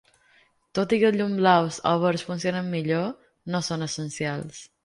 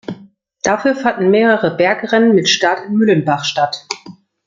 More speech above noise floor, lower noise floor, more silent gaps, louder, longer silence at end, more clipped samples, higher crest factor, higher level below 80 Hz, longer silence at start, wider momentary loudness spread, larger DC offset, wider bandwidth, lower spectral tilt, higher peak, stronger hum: first, 37 dB vs 30 dB; first, -62 dBFS vs -44 dBFS; neither; second, -25 LUFS vs -14 LUFS; second, 0.2 s vs 0.35 s; neither; first, 20 dB vs 14 dB; second, -64 dBFS vs -58 dBFS; first, 0.75 s vs 0.1 s; about the same, 12 LU vs 13 LU; neither; first, 11.5 kHz vs 7.6 kHz; about the same, -5.5 dB/octave vs -4.5 dB/octave; second, -6 dBFS vs 0 dBFS; neither